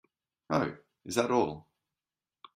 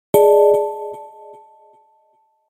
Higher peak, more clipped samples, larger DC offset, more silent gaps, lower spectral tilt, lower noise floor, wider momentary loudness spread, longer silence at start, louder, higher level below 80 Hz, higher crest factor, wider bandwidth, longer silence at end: second, -12 dBFS vs -2 dBFS; neither; neither; neither; about the same, -5 dB/octave vs -5.5 dB/octave; first, under -90 dBFS vs -60 dBFS; second, 16 LU vs 21 LU; first, 0.5 s vs 0.15 s; second, -31 LUFS vs -14 LUFS; second, -68 dBFS vs -62 dBFS; first, 22 dB vs 16 dB; about the same, 15.5 kHz vs 16 kHz; second, 0.95 s vs 1.4 s